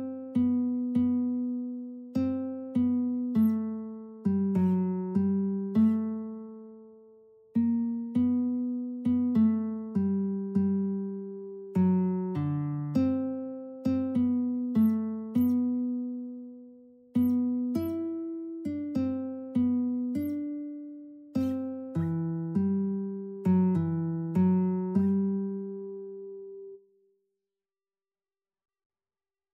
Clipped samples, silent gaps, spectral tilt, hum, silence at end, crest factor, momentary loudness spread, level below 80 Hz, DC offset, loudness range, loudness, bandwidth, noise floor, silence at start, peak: under 0.1%; none; -10.5 dB/octave; none; 2.75 s; 14 dB; 14 LU; -66 dBFS; under 0.1%; 4 LU; -29 LUFS; 14 kHz; under -90 dBFS; 0 s; -14 dBFS